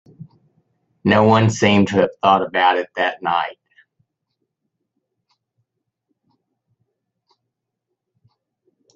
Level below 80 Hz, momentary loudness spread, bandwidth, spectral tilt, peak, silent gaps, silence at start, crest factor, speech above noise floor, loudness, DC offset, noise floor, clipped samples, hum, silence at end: -58 dBFS; 8 LU; 8 kHz; -5.5 dB/octave; 0 dBFS; none; 0.2 s; 20 dB; 63 dB; -17 LUFS; under 0.1%; -79 dBFS; under 0.1%; none; 5.45 s